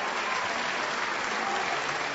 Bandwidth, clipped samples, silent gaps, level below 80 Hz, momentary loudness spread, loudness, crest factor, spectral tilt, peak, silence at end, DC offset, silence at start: 8 kHz; under 0.1%; none; -66 dBFS; 1 LU; -29 LUFS; 14 dB; 0.5 dB/octave; -16 dBFS; 0 s; under 0.1%; 0 s